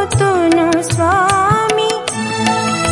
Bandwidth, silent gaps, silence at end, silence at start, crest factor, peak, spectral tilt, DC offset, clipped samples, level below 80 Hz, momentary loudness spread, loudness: 11.5 kHz; none; 0 s; 0 s; 14 dB; 0 dBFS; -4.5 dB/octave; under 0.1%; under 0.1%; -42 dBFS; 5 LU; -14 LUFS